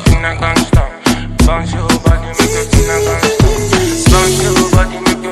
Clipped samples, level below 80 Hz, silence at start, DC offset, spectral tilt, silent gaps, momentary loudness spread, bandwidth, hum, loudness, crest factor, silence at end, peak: under 0.1%; -16 dBFS; 0 s; under 0.1%; -4.5 dB/octave; none; 4 LU; 15.5 kHz; none; -12 LUFS; 10 dB; 0 s; 0 dBFS